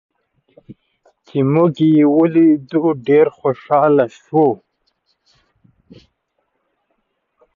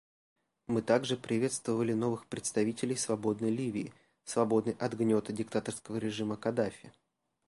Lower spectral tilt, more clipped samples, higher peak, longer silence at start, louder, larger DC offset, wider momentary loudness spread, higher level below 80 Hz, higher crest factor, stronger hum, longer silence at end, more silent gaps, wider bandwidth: first, -9.5 dB/octave vs -5 dB/octave; neither; first, -2 dBFS vs -12 dBFS; about the same, 0.7 s vs 0.7 s; first, -15 LUFS vs -33 LUFS; neither; about the same, 7 LU vs 7 LU; first, -64 dBFS vs -70 dBFS; about the same, 16 dB vs 20 dB; neither; first, 3 s vs 0.6 s; neither; second, 7 kHz vs 11.5 kHz